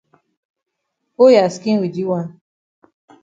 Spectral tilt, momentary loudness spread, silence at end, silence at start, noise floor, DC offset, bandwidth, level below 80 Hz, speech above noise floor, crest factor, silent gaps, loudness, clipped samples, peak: -6.5 dB/octave; 12 LU; 0.95 s; 1.2 s; -74 dBFS; under 0.1%; 7.8 kHz; -68 dBFS; 60 dB; 18 dB; none; -15 LUFS; under 0.1%; 0 dBFS